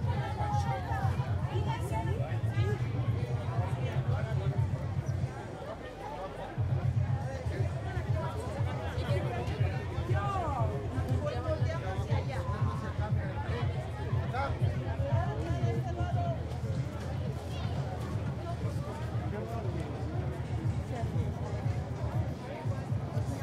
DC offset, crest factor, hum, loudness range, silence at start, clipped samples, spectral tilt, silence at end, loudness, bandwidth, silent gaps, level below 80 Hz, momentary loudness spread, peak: under 0.1%; 14 dB; none; 3 LU; 0 s; under 0.1%; -7.5 dB/octave; 0 s; -34 LUFS; 12.5 kHz; none; -46 dBFS; 5 LU; -18 dBFS